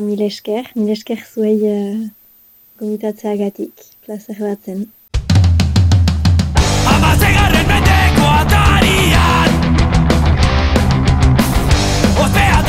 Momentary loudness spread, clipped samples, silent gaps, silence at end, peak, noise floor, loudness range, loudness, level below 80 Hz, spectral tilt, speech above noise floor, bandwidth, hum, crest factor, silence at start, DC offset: 13 LU; under 0.1%; none; 0 s; -2 dBFS; -47 dBFS; 10 LU; -13 LUFS; -20 dBFS; -5.5 dB/octave; 28 dB; 16.5 kHz; none; 12 dB; 0 s; under 0.1%